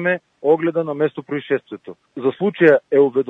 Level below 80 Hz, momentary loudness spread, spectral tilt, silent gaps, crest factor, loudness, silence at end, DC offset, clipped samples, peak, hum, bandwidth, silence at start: -72 dBFS; 15 LU; -9 dB/octave; none; 16 dB; -18 LUFS; 0 s; under 0.1%; under 0.1%; -2 dBFS; none; 4 kHz; 0 s